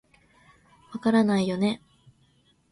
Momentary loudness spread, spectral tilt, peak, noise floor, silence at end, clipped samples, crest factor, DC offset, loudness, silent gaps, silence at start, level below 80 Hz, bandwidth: 15 LU; -6.5 dB/octave; -10 dBFS; -64 dBFS; 0.95 s; under 0.1%; 18 dB; under 0.1%; -25 LUFS; none; 0.9 s; -64 dBFS; 11.5 kHz